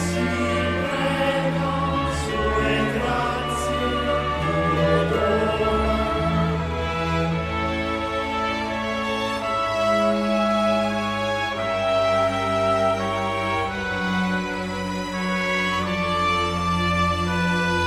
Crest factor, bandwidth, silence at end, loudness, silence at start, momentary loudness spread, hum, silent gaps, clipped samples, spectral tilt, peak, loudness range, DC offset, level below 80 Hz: 14 dB; 15 kHz; 0 s; -22 LUFS; 0 s; 4 LU; none; none; under 0.1%; -5.5 dB/octave; -8 dBFS; 2 LU; under 0.1%; -38 dBFS